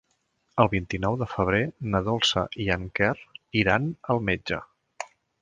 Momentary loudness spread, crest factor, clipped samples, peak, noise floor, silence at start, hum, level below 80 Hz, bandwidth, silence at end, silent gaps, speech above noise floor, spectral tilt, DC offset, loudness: 12 LU; 22 dB; under 0.1%; -4 dBFS; -72 dBFS; 0.55 s; none; -46 dBFS; 9.8 kHz; 0.35 s; none; 46 dB; -5.5 dB/octave; under 0.1%; -26 LUFS